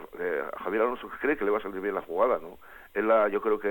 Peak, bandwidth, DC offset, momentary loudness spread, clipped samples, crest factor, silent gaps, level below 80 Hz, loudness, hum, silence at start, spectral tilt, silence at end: -12 dBFS; 17.5 kHz; under 0.1%; 8 LU; under 0.1%; 16 dB; none; -60 dBFS; -28 LUFS; none; 0 s; -7 dB/octave; 0 s